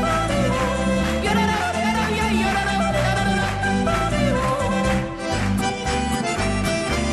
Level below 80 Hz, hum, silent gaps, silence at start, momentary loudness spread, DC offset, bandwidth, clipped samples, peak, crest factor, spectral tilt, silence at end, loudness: -32 dBFS; none; none; 0 s; 3 LU; under 0.1%; 13.5 kHz; under 0.1%; -8 dBFS; 14 dB; -5 dB/octave; 0 s; -21 LUFS